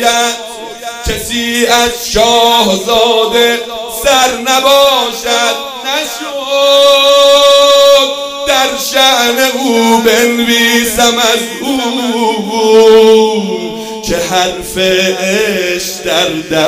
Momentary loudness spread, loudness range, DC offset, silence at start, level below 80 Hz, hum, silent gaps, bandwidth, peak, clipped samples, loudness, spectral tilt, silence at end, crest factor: 11 LU; 3 LU; under 0.1%; 0 s; -36 dBFS; none; none; 16.5 kHz; 0 dBFS; 0.8%; -9 LUFS; -2 dB/octave; 0 s; 10 dB